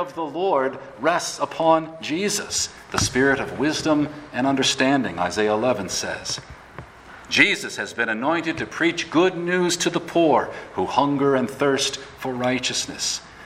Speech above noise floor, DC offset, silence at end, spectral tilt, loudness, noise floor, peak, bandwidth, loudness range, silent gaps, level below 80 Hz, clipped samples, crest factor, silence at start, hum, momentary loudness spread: 20 dB; under 0.1%; 0 s; -3.5 dB/octave; -22 LUFS; -42 dBFS; 0 dBFS; 16 kHz; 2 LU; none; -52 dBFS; under 0.1%; 22 dB; 0 s; none; 9 LU